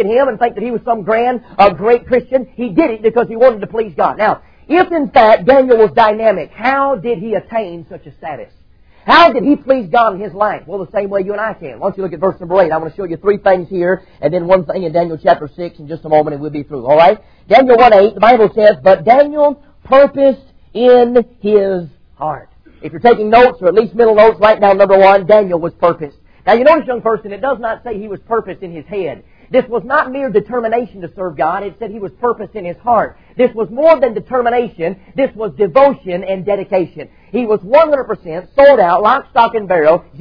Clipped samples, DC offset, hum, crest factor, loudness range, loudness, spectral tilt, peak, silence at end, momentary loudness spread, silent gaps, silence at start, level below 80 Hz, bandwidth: 0.2%; 0.4%; none; 12 dB; 8 LU; -12 LUFS; -7.5 dB/octave; 0 dBFS; 0 s; 15 LU; none; 0 s; -44 dBFS; 5.4 kHz